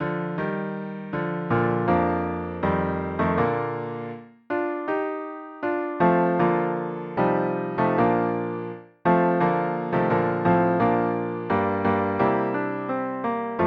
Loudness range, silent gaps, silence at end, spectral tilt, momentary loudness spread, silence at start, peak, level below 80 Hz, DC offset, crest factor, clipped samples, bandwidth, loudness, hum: 4 LU; none; 0 s; -10 dB/octave; 10 LU; 0 s; -8 dBFS; -54 dBFS; under 0.1%; 16 dB; under 0.1%; 5.2 kHz; -24 LUFS; none